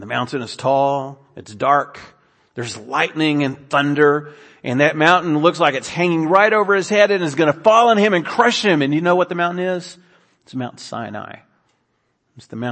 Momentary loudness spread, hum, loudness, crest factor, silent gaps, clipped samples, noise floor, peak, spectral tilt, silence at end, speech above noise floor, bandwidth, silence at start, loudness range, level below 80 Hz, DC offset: 16 LU; none; -16 LUFS; 18 dB; none; under 0.1%; -67 dBFS; 0 dBFS; -5 dB/octave; 0 s; 50 dB; 8.8 kHz; 0 s; 7 LU; -64 dBFS; under 0.1%